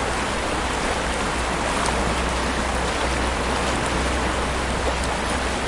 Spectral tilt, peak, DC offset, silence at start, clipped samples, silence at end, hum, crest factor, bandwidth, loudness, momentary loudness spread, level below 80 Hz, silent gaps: -4 dB/octave; -6 dBFS; under 0.1%; 0 s; under 0.1%; 0 s; none; 16 dB; 11.5 kHz; -23 LUFS; 2 LU; -30 dBFS; none